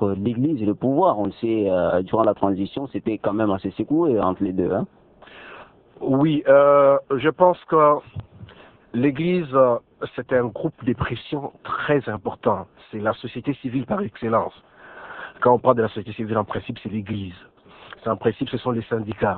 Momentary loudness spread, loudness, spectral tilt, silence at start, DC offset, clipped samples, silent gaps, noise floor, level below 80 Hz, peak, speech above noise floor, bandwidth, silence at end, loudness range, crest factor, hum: 14 LU; -22 LUFS; -11 dB/octave; 0 s; under 0.1%; under 0.1%; none; -45 dBFS; -54 dBFS; -2 dBFS; 24 dB; 4.4 kHz; 0 s; 7 LU; 20 dB; none